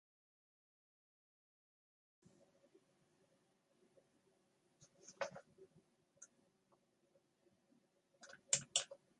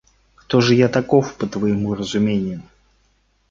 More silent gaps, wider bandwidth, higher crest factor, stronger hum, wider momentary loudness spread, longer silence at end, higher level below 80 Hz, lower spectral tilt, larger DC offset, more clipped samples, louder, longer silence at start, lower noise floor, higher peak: neither; first, 11 kHz vs 7.6 kHz; first, 34 dB vs 18 dB; neither; first, 26 LU vs 10 LU; second, 0.25 s vs 0.9 s; second, under -90 dBFS vs -50 dBFS; second, 0 dB/octave vs -6.5 dB/octave; neither; neither; second, -41 LUFS vs -19 LUFS; first, 4.8 s vs 0.5 s; first, -79 dBFS vs -62 dBFS; second, -18 dBFS vs -2 dBFS